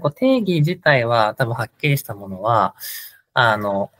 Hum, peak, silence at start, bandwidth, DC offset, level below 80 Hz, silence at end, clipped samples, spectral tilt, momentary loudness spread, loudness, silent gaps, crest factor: none; -2 dBFS; 0 s; 16 kHz; under 0.1%; -60 dBFS; 0.1 s; under 0.1%; -6 dB/octave; 12 LU; -19 LUFS; none; 18 dB